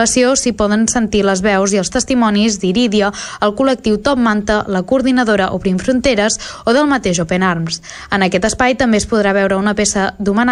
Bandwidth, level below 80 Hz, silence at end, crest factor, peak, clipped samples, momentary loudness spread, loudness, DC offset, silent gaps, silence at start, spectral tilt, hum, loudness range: 12 kHz; -36 dBFS; 0 s; 12 dB; -2 dBFS; under 0.1%; 4 LU; -14 LUFS; under 0.1%; none; 0 s; -4 dB/octave; none; 1 LU